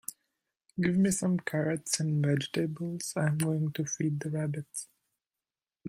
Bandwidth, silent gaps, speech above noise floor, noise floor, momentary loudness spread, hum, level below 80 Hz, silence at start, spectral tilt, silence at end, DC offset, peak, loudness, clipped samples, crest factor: 16 kHz; none; over 60 dB; under -90 dBFS; 12 LU; none; -66 dBFS; 0.1 s; -5.5 dB/octave; 0 s; under 0.1%; -12 dBFS; -31 LUFS; under 0.1%; 20 dB